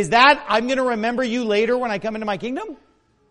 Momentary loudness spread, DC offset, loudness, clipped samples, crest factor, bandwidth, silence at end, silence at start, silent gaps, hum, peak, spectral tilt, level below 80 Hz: 13 LU; under 0.1%; -19 LUFS; under 0.1%; 20 dB; 11 kHz; 0.55 s; 0 s; none; none; 0 dBFS; -4 dB/octave; -54 dBFS